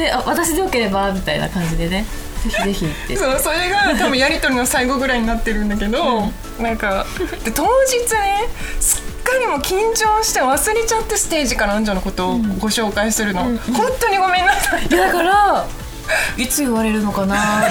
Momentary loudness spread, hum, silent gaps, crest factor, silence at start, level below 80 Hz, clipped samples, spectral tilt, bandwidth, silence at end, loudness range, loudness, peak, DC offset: 7 LU; none; none; 16 dB; 0 s; -28 dBFS; under 0.1%; -3 dB/octave; over 20 kHz; 0 s; 3 LU; -17 LUFS; 0 dBFS; under 0.1%